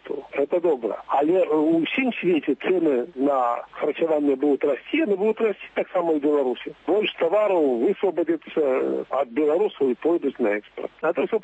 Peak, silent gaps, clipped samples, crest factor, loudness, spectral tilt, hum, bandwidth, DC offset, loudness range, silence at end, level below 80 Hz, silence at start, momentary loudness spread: -10 dBFS; none; under 0.1%; 12 dB; -23 LUFS; -7.5 dB/octave; none; 8 kHz; under 0.1%; 1 LU; 0.05 s; -70 dBFS; 0.05 s; 6 LU